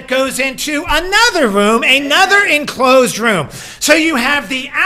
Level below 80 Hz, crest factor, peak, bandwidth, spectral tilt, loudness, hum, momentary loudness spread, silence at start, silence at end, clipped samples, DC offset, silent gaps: -36 dBFS; 12 dB; 0 dBFS; 19.5 kHz; -2.5 dB/octave; -11 LUFS; none; 8 LU; 0 s; 0 s; 0.3%; under 0.1%; none